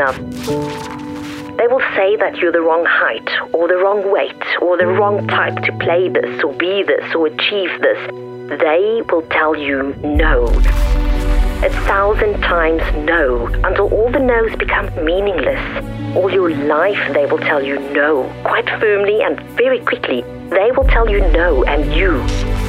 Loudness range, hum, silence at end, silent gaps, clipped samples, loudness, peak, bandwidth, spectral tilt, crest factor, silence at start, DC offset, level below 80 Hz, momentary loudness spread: 1 LU; none; 0 s; none; under 0.1%; -15 LUFS; -4 dBFS; 11.5 kHz; -6 dB/octave; 12 dB; 0 s; under 0.1%; -22 dBFS; 6 LU